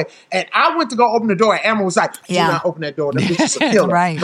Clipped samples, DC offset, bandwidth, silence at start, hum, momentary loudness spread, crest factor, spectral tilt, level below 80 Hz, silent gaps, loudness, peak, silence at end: under 0.1%; under 0.1%; 15 kHz; 0 s; none; 6 LU; 14 dB; -4.5 dB/octave; -64 dBFS; none; -16 LUFS; -2 dBFS; 0 s